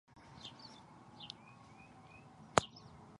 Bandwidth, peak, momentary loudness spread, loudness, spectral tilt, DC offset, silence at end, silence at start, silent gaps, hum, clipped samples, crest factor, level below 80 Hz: 11 kHz; -6 dBFS; 23 LU; -41 LUFS; -3.5 dB/octave; under 0.1%; 0 s; 0.1 s; none; none; under 0.1%; 40 dB; -66 dBFS